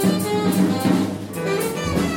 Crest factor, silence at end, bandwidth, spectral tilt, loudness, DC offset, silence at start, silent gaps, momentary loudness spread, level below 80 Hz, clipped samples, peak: 14 dB; 0 s; 17 kHz; -5.5 dB/octave; -21 LUFS; under 0.1%; 0 s; none; 6 LU; -44 dBFS; under 0.1%; -6 dBFS